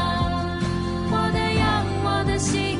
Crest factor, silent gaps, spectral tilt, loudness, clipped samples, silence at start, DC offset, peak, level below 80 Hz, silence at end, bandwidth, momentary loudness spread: 12 dB; none; -5 dB/octave; -23 LUFS; under 0.1%; 0 s; under 0.1%; -10 dBFS; -36 dBFS; 0 s; 11.5 kHz; 4 LU